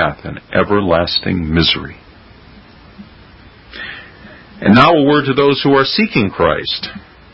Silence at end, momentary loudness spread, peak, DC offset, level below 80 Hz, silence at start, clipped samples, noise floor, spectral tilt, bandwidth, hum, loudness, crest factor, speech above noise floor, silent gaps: 0.35 s; 19 LU; 0 dBFS; under 0.1%; -36 dBFS; 0 s; under 0.1%; -41 dBFS; -7.5 dB/octave; 8 kHz; none; -13 LUFS; 16 dB; 27 dB; none